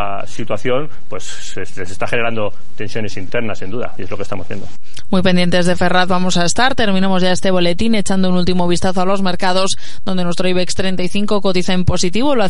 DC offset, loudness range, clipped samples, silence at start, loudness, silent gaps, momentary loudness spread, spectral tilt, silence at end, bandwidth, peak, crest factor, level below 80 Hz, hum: 20%; 8 LU; under 0.1%; 0 s; -17 LUFS; none; 13 LU; -5 dB/octave; 0 s; 11.5 kHz; 0 dBFS; 16 dB; -38 dBFS; none